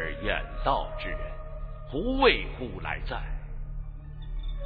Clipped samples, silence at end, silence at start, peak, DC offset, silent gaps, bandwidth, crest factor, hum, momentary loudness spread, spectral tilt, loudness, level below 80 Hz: under 0.1%; 0 s; 0 s; -8 dBFS; under 0.1%; none; 4.9 kHz; 22 dB; none; 19 LU; -8.5 dB/octave; -30 LUFS; -36 dBFS